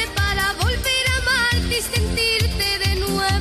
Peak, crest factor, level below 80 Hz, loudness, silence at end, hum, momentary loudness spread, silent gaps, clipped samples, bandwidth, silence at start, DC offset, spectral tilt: -8 dBFS; 12 dB; -28 dBFS; -19 LUFS; 0 s; none; 3 LU; none; under 0.1%; 14 kHz; 0 s; under 0.1%; -3 dB/octave